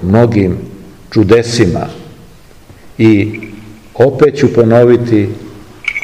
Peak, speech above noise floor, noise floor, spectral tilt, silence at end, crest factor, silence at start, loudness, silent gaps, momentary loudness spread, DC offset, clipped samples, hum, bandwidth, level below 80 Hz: 0 dBFS; 29 dB; -38 dBFS; -7 dB/octave; 0 s; 12 dB; 0 s; -10 LUFS; none; 19 LU; 0.7%; 2%; none; 12 kHz; -40 dBFS